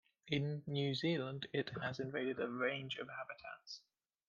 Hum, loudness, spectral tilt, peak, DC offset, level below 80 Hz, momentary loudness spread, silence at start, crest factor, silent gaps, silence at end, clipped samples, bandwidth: none; -41 LUFS; -6.5 dB/octave; -22 dBFS; under 0.1%; -78 dBFS; 13 LU; 0.25 s; 18 dB; none; 0.5 s; under 0.1%; 7.2 kHz